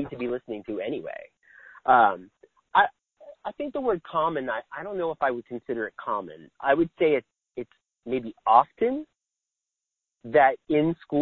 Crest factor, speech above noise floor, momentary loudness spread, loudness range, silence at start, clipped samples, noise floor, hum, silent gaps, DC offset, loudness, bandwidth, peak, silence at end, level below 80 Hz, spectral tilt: 24 dB; 61 dB; 19 LU; 4 LU; 0 s; under 0.1%; -87 dBFS; none; none; under 0.1%; -25 LUFS; 4.3 kHz; -4 dBFS; 0 s; -64 dBFS; -8.5 dB/octave